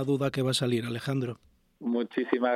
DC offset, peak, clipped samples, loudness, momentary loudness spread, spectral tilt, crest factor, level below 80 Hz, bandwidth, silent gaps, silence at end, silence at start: under 0.1%; -8 dBFS; under 0.1%; -30 LUFS; 10 LU; -5.5 dB/octave; 20 dB; -66 dBFS; 14.5 kHz; none; 0 s; 0 s